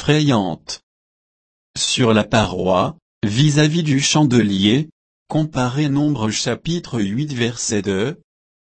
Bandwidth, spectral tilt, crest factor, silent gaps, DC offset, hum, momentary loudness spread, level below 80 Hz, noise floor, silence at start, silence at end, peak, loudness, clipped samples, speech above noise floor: 8.8 kHz; -5 dB/octave; 16 dB; 0.83-1.74 s, 3.02-3.21 s, 4.92-5.26 s; under 0.1%; none; 11 LU; -46 dBFS; under -90 dBFS; 0 s; 0.65 s; -2 dBFS; -18 LUFS; under 0.1%; over 73 dB